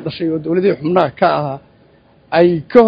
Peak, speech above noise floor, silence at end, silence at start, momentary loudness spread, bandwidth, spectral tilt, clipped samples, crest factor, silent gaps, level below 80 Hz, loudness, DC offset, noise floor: 0 dBFS; 36 dB; 0 s; 0 s; 7 LU; 5.4 kHz; -9 dB/octave; 0.3%; 14 dB; none; -52 dBFS; -15 LUFS; under 0.1%; -49 dBFS